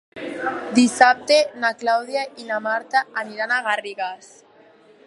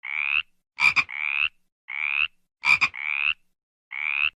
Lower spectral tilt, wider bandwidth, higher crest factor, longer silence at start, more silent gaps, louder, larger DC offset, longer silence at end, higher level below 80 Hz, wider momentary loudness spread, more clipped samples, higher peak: first, -2.5 dB/octave vs 0 dB/octave; second, 11.5 kHz vs 14 kHz; about the same, 22 dB vs 20 dB; about the same, 0.15 s vs 0.05 s; second, none vs 1.72-1.88 s, 3.63-3.91 s; first, -20 LUFS vs -23 LUFS; neither; first, 0.9 s vs 0.05 s; second, -70 dBFS vs -64 dBFS; first, 14 LU vs 11 LU; neither; first, 0 dBFS vs -8 dBFS